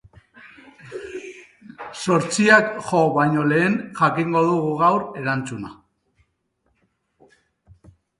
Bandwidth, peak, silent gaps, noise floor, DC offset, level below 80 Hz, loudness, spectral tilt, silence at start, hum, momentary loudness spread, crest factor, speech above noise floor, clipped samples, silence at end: 11.5 kHz; 0 dBFS; none; -70 dBFS; under 0.1%; -60 dBFS; -19 LUFS; -5.5 dB/octave; 0.45 s; none; 21 LU; 22 dB; 51 dB; under 0.1%; 2.45 s